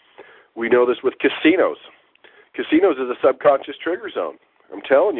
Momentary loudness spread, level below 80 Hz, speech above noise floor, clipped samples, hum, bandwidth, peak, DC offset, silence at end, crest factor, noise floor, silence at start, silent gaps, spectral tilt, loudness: 19 LU; -64 dBFS; 33 dB; under 0.1%; none; 4.1 kHz; -4 dBFS; under 0.1%; 0 s; 16 dB; -52 dBFS; 0.2 s; none; -8.5 dB/octave; -19 LUFS